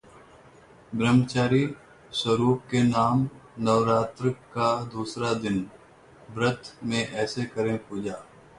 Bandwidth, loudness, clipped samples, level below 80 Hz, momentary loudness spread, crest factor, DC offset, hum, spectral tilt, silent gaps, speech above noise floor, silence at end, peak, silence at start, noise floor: 11 kHz; -26 LUFS; under 0.1%; -58 dBFS; 12 LU; 18 dB; under 0.1%; none; -6 dB/octave; none; 27 dB; 0.35 s; -8 dBFS; 0.9 s; -52 dBFS